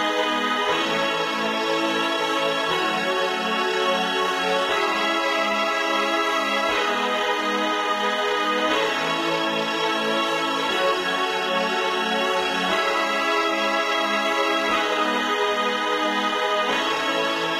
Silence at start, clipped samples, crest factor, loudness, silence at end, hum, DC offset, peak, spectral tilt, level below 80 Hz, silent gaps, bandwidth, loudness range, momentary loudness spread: 0 s; under 0.1%; 14 dB; -22 LUFS; 0 s; none; under 0.1%; -8 dBFS; -2.5 dB/octave; -62 dBFS; none; 16 kHz; 1 LU; 2 LU